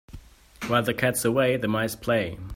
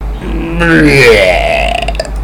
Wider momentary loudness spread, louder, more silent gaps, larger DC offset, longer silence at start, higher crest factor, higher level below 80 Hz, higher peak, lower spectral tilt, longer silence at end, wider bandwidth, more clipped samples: second, 4 LU vs 13 LU; second, -24 LUFS vs -8 LUFS; neither; neither; about the same, 0.1 s vs 0 s; first, 18 dB vs 8 dB; second, -52 dBFS vs -18 dBFS; second, -8 dBFS vs 0 dBFS; about the same, -4.5 dB/octave vs -5 dB/octave; about the same, 0 s vs 0 s; second, 16.5 kHz vs 18.5 kHz; second, under 0.1% vs 4%